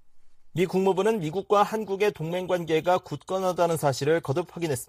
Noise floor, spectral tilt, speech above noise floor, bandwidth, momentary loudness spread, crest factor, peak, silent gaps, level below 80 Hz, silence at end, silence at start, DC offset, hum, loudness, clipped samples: -46 dBFS; -5.5 dB/octave; 20 dB; 15 kHz; 7 LU; 16 dB; -10 dBFS; none; -62 dBFS; 0.05 s; 0.05 s; under 0.1%; none; -26 LUFS; under 0.1%